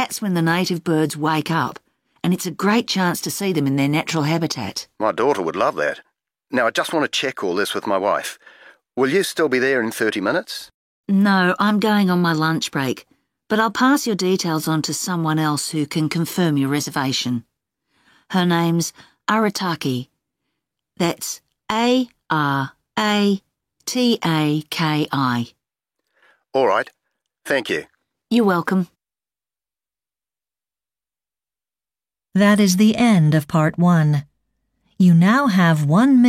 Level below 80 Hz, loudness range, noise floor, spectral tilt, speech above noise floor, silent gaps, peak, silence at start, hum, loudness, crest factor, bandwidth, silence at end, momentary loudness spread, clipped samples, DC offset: -62 dBFS; 6 LU; under -90 dBFS; -5.5 dB/octave; over 72 dB; 10.74-11.04 s; -4 dBFS; 0 s; none; -19 LUFS; 16 dB; 16.5 kHz; 0 s; 10 LU; under 0.1%; under 0.1%